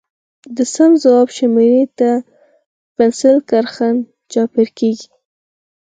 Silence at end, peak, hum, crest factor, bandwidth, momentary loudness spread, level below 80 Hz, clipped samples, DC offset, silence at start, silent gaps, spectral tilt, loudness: 0.8 s; 0 dBFS; none; 14 dB; 9.4 kHz; 10 LU; -64 dBFS; under 0.1%; under 0.1%; 0.5 s; 2.66-2.95 s; -5 dB/octave; -14 LUFS